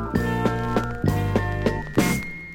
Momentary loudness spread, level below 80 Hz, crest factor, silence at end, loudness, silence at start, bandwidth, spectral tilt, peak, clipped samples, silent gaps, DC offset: 3 LU; -36 dBFS; 18 dB; 0 s; -24 LUFS; 0 s; 17.5 kHz; -6 dB/octave; -6 dBFS; under 0.1%; none; under 0.1%